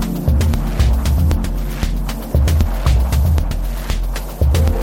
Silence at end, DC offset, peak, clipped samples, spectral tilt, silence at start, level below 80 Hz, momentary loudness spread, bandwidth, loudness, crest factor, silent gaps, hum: 0 s; under 0.1%; -2 dBFS; under 0.1%; -6.5 dB/octave; 0 s; -16 dBFS; 7 LU; 17 kHz; -18 LUFS; 14 dB; none; none